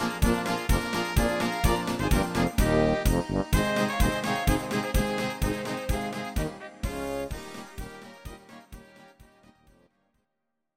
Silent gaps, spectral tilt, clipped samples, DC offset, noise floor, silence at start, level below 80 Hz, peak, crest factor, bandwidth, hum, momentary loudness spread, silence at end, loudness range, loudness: none; -5 dB/octave; under 0.1%; under 0.1%; -82 dBFS; 0 s; -34 dBFS; -8 dBFS; 20 dB; 17 kHz; none; 17 LU; 1.55 s; 14 LU; -27 LUFS